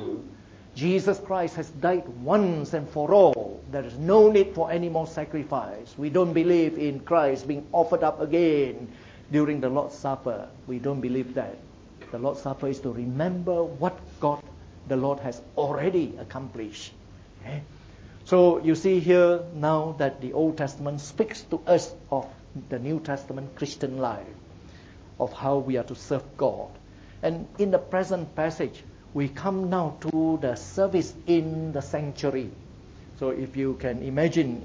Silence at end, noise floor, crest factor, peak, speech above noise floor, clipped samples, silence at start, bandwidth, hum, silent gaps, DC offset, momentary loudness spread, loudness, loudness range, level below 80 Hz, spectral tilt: 0 s; -47 dBFS; 20 dB; -6 dBFS; 22 dB; under 0.1%; 0 s; 8 kHz; none; none; under 0.1%; 15 LU; -26 LUFS; 8 LU; -54 dBFS; -7 dB/octave